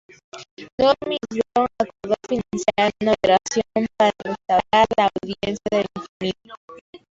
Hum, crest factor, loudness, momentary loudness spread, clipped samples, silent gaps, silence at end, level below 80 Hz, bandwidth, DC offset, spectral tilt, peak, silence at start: none; 18 dB; -21 LUFS; 12 LU; under 0.1%; 0.51-0.57 s, 0.72-0.78 s, 6.09-6.20 s, 6.57-6.68 s, 6.81-6.93 s; 0.15 s; -52 dBFS; 8 kHz; under 0.1%; -4.5 dB/octave; -4 dBFS; 0.35 s